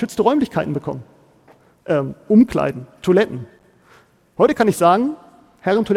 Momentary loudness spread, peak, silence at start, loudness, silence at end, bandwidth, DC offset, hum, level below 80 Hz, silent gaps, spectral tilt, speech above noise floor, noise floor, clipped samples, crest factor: 18 LU; -2 dBFS; 0 s; -18 LUFS; 0 s; 15.5 kHz; under 0.1%; none; -52 dBFS; none; -6.5 dB/octave; 35 dB; -52 dBFS; under 0.1%; 18 dB